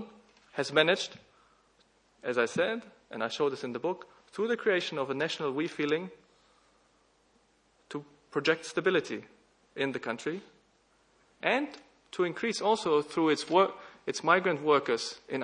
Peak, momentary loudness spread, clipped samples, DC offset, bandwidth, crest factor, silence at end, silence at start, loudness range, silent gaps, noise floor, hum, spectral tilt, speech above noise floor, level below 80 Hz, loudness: -8 dBFS; 16 LU; under 0.1%; under 0.1%; 10.5 kHz; 24 dB; 0 s; 0 s; 7 LU; none; -68 dBFS; none; -4 dB/octave; 38 dB; -78 dBFS; -30 LUFS